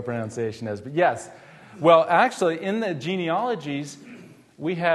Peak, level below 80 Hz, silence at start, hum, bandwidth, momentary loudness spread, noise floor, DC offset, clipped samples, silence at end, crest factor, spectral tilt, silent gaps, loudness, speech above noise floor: -4 dBFS; -70 dBFS; 0 s; none; 12.5 kHz; 15 LU; -46 dBFS; under 0.1%; under 0.1%; 0 s; 20 dB; -5.5 dB/octave; none; -23 LUFS; 23 dB